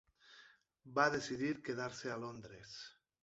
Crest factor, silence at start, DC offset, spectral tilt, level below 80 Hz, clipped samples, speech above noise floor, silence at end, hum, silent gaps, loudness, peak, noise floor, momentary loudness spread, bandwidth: 24 dB; 0.25 s; under 0.1%; -3.5 dB/octave; -74 dBFS; under 0.1%; 26 dB; 0.3 s; none; none; -39 LUFS; -18 dBFS; -66 dBFS; 23 LU; 8 kHz